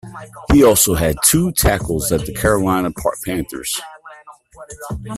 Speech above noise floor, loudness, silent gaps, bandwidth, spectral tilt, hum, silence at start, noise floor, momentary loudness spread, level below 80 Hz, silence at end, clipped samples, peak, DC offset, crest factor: 25 dB; -16 LUFS; none; 16 kHz; -4 dB/octave; none; 0.05 s; -42 dBFS; 18 LU; -30 dBFS; 0 s; under 0.1%; 0 dBFS; under 0.1%; 18 dB